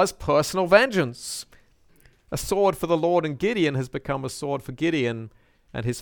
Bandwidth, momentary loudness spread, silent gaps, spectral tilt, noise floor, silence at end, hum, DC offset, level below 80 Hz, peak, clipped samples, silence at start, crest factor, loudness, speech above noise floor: 19 kHz; 15 LU; none; -5 dB/octave; -57 dBFS; 0 s; none; under 0.1%; -50 dBFS; -2 dBFS; under 0.1%; 0 s; 22 dB; -24 LUFS; 33 dB